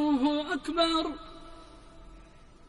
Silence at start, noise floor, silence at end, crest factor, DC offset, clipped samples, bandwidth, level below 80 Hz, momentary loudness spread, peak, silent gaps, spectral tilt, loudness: 0 s; -53 dBFS; 0.3 s; 18 dB; under 0.1%; under 0.1%; 11.5 kHz; -52 dBFS; 23 LU; -12 dBFS; none; -4 dB/octave; -28 LUFS